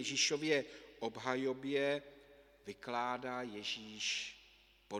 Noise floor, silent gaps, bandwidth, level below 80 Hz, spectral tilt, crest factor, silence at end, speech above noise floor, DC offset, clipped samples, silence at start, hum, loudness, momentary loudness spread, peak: -66 dBFS; none; 15 kHz; -74 dBFS; -2.5 dB/octave; 22 dB; 0 s; 27 dB; under 0.1%; under 0.1%; 0 s; none; -38 LUFS; 17 LU; -18 dBFS